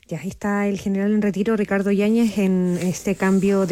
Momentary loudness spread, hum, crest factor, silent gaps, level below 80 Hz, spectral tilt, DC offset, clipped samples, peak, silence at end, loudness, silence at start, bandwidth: 5 LU; none; 10 dB; none; -52 dBFS; -7 dB/octave; under 0.1%; under 0.1%; -10 dBFS; 0 s; -20 LUFS; 0.1 s; 15 kHz